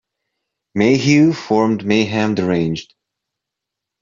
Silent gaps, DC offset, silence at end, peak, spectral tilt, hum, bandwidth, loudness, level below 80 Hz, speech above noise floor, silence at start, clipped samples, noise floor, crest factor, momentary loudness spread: none; under 0.1%; 1.2 s; -2 dBFS; -6 dB/octave; none; 7.6 kHz; -16 LUFS; -56 dBFS; 67 dB; 0.75 s; under 0.1%; -82 dBFS; 16 dB; 9 LU